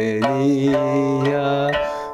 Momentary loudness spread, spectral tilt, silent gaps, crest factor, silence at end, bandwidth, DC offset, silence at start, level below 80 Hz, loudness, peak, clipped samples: 2 LU; -7 dB/octave; none; 14 dB; 0 s; 12 kHz; under 0.1%; 0 s; -50 dBFS; -19 LUFS; -4 dBFS; under 0.1%